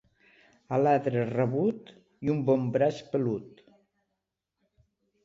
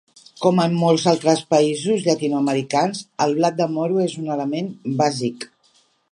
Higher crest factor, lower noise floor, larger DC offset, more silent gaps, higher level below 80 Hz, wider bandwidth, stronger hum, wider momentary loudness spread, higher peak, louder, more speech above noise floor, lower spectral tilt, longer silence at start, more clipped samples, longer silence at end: about the same, 18 dB vs 18 dB; first, -84 dBFS vs -60 dBFS; neither; neither; about the same, -68 dBFS vs -70 dBFS; second, 7.6 kHz vs 11.5 kHz; neither; about the same, 8 LU vs 9 LU; second, -12 dBFS vs -2 dBFS; second, -28 LUFS vs -20 LUFS; first, 57 dB vs 41 dB; first, -8.5 dB/octave vs -5.5 dB/octave; first, 0.7 s vs 0.4 s; neither; first, 1.75 s vs 0.65 s